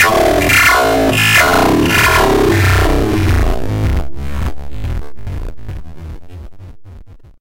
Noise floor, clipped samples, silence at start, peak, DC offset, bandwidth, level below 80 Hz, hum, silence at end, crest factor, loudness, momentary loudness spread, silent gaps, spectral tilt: -35 dBFS; under 0.1%; 0 s; 0 dBFS; under 0.1%; 17 kHz; -22 dBFS; none; 0.05 s; 12 dB; -11 LUFS; 21 LU; none; -4.5 dB/octave